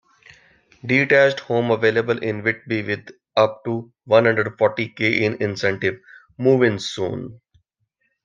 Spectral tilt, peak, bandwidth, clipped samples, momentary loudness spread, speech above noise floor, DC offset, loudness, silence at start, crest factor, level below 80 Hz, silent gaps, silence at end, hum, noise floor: -6 dB/octave; -2 dBFS; 7.6 kHz; under 0.1%; 12 LU; 52 dB; under 0.1%; -20 LUFS; 0.85 s; 20 dB; -62 dBFS; none; 0.9 s; none; -71 dBFS